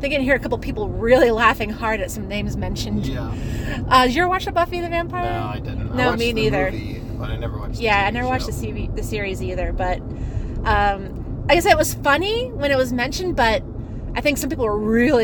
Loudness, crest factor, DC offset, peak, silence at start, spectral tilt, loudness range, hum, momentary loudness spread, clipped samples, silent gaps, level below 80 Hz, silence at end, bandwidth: -21 LUFS; 20 dB; under 0.1%; 0 dBFS; 0 s; -5 dB/octave; 4 LU; none; 12 LU; under 0.1%; none; -30 dBFS; 0 s; 18 kHz